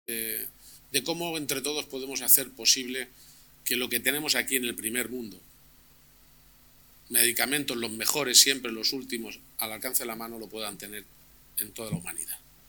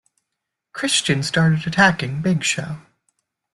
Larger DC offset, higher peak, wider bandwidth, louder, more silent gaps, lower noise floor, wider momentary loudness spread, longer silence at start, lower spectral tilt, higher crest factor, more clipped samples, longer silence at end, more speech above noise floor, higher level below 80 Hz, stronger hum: neither; about the same, -4 dBFS vs -2 dBFS; first, 19.5 kHz vs 12 kHz; second, -26 LUFS vs -19 LUFS; neither; second, -58 dBFS vs -81 dBFS; about the same, 17 LU vs 15 LU; second, 0.1 s vs 0.75 s; second, -1 dB/octave vs -4 dB/octave; first, 26 dB vs 20 dB; neither; second, 0.3 s vs 0.75 s; second, 29 dB vs 62 dB; second, -64 dBFS vs -56 dBFS; neither